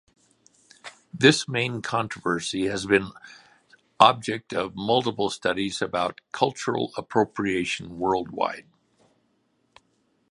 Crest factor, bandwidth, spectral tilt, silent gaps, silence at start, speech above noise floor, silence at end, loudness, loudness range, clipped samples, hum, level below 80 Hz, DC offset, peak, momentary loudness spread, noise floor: 26 dB; 11.5 kHz; -4.5 dB/octave; none; 0.85 s; 45 dB; 1.7 s; -24 LUFS; 4 LU; under 0.1%; none; -60 dBFS; under 0.1%; 0 dBFS; 11 LU; -69 dBFS